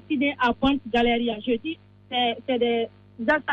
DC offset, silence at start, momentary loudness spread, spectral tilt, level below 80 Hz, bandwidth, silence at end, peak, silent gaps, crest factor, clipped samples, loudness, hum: under 0.1%; 0.1 s; 8 LU; -6 dB/octave; -48 dBFS; 7.2 kHz; 0 s; -10 dBFS; none; 14 dB; under 0.1%; -24 LUFS; none